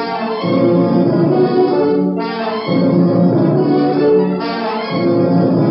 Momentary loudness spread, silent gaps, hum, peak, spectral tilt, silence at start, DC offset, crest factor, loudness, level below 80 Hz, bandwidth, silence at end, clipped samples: 6 LU; none; none; 0 dBFS; -11 dB/octave; 0 s; under 0.1%; 12 dB; -14 LUFS; -62 dBFS; 5.8 kHz; 0 s; under 0.1%